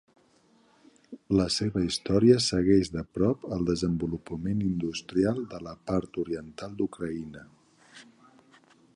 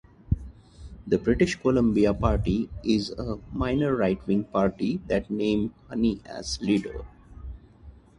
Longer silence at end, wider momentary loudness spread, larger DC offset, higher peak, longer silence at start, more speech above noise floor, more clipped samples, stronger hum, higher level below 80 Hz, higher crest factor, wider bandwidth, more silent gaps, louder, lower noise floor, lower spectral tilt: first, 0.95 s vs 0.3 s; about the same, 13 LU vs 15 LU; neither; about the same, -8 dBFS vs -8 dBFS; first, 1.1 s vs 0.3 s; first, 36 dB vs 24 dB; neither; neither; second, -50 dBFS vs -40 dBFS; about the same, 22 dB vs 18 dB; about the same, 11.5 kHz vs 11 kHz; neither; about the same, -28 LUFS vs -26 LUFS; first, -63 dBFS vs -49 dBFS; about the same, -6 dB/octave vs -6.5 dB/octave